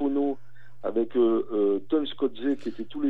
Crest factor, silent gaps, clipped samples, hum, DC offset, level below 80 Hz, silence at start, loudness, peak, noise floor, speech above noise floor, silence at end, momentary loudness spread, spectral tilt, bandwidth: 14 dB; none; under 0.1%; none; 2%; -80 dBFS; 0 s; -27 LUFS; -14 dBFS; -53 dBFS; 27 dB; 0 s; 10 LU; -7.5 dB/octave; 4.9 kHz